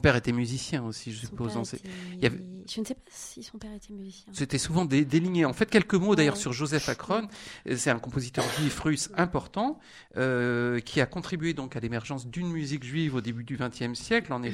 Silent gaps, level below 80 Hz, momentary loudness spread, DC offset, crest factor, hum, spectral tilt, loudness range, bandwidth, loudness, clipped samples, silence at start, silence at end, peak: none; -52 dBFS; 16 LU; under 0.1%; 22 dB; none; -5 dB/octave; 8 LU; 16 kHz; -29 LUFS; under 0.1%; 0 s; 0 s; -6 dBFS